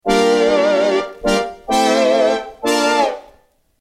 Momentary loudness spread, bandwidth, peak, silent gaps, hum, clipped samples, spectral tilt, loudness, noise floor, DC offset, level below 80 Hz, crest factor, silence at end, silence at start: 6 LU; 16 kHz; -2 dBFS; none; none; under 0.1%; -3.5 dB/octave; -16 LUFS; -54 dBFS; under 0.1%; -44 dBFS; 14 dB; 0.6 s; 0.05 s